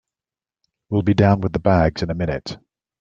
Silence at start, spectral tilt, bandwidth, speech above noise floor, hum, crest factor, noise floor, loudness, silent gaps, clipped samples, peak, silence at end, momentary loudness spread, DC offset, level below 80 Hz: 0.9 s; -8 dB/octave; 7.4 kHz; over 72 dB; none; 18 dB; under -90 dBFS; -19 LUFS; none; under 0.1%; -2 dBFS; 0.45 s; 13 LU; under 0.1%; -40 dBFS